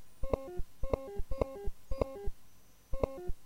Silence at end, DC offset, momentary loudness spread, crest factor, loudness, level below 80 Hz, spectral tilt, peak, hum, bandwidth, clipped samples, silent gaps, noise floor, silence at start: 0 s; under 0.1%; 8 LU; 22 dB; -40 LUFS; -42 dBFS; -7.5 dB/octave; -14 dBFS; none; 15.5 kHz; under 0.1%; none; -58 dBFS; 0 s